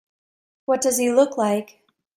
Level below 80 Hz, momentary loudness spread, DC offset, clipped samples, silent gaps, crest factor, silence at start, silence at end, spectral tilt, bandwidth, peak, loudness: -70 dBFS; 8 LU; under 0.1%; under 0.1%; none; 18 dB; 0.7 s; 0.5 s; -3.5 dB/octave; 16 kHz; -4 dBFS; -21 LUFS